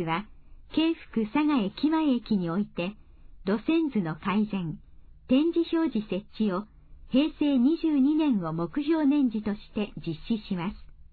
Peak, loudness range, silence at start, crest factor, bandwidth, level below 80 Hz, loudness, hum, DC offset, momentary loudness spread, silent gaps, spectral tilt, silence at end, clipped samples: -12 dBFS; 3 LU; 0 s; 14 dB; 4.7 kHz; -52 dBFS; -27 LUFS; none; under 0.1%; 10 LU; none; -10 dB/octave; 0.1 s; under 0.1%